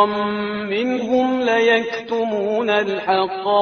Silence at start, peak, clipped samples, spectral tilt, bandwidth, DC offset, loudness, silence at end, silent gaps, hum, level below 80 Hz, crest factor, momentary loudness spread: 0 s; -2 dBFS; under 0.1%; -2.5 dB/octave; 6.6 kHz; under 0.1%; -19 LUFS; 0 s; none; none; -60 dBFS; 18 dB; 6 LU